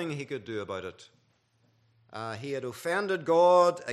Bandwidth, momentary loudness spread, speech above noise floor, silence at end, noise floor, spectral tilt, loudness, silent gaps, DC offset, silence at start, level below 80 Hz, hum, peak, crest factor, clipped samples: 13.5 kHz; 18 LU; 41 dB; 0 s; -69 dBFS; -5.5 dB/octave; -28 LUFS; none; under 0.1%; 0 s; -78 dBFS; none; -10 dBFS; 20 dB; under 0.1%